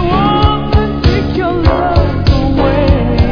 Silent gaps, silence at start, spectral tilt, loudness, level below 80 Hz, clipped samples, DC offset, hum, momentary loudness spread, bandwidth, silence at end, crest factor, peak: none; 0 s; -8.5 dB/octave; -12 LUFS; -16 dBFS; 0.3%; under 0.1%; none; 2 LU; 5.4 kHz; 0 s; 10 dB; 0 dBFS